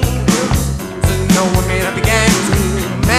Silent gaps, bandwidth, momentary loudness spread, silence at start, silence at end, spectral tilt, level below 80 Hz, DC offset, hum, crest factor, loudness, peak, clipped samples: none; 15.5 kHz; 5 LU; 0 s; 0 s; -4.5 dB/octave; -22 dBFS; under 0.1%; none; 14 dB; -14 LUFS; 0 dBFS; under 0.1%